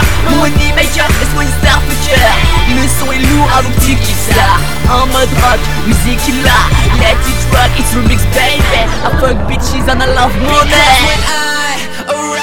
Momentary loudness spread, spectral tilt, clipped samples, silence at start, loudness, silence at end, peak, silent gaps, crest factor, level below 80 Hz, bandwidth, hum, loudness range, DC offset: 5 LU; -4 dB/octave; 0.4%; 0 s; -10 LUFS; 0 s; 0 dBFS; none; 10 dB; -14 dBFS; 19 kHz; none; 1 LU; 20%